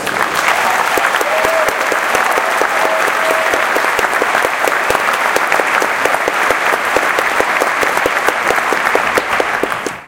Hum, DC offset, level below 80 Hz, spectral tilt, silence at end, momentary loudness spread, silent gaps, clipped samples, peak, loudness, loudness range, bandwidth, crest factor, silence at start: none; under 0.1%; -48 dBFS; -1.5 dB/octave; 0 s; 1 LU; none; under 0.1%; 0 dBFS; -13 LUFS; 0 LU; over 20 kHz; 14 dB; 0 s